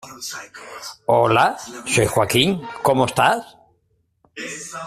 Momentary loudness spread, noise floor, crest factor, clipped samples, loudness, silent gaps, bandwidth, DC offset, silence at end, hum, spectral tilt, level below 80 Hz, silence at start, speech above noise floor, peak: 18 LU; -66 dBFS; 18 dB; under 0.1%; -19 LUFS; none; 15.5 kHz; under 0.1%; 0 s; none; -4 dB/octave; -52 dBFS; 0.05 s; 46 dB; -2 dBFS